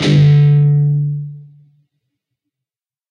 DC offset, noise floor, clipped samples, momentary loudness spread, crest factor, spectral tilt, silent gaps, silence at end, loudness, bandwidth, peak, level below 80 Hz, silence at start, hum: under 0.1%; -87 dBFS; under 0.1%; 15 LU; 12 dB; -8 dB/octave; none; 1.7 s; -12 LUFS; 7 kHz; -2 dBFS; -52 dBFS; 0 s; none